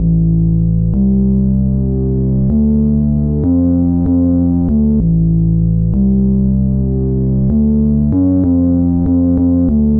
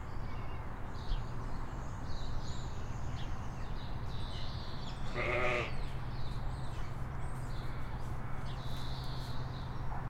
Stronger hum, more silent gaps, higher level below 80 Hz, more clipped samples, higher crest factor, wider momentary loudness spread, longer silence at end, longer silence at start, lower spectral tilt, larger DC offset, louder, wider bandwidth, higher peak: neither; neither; first, -20 dBFS vs -42 dBFS; neither; second, 6 dB vs 18 dB; second, 2 LU vs 8 LU; about the same, 0 s vs 0 s; about the same, 0 s vs 0 s; first, -16.5 dB/octave vs -6 dB/octave; first, 1% vs under 0.1%; first, -13 LUFS vs -41 LUFS; second, 1.6 kHz vs 9.2 kHz; first, -4 dBFS vs -18 dBFS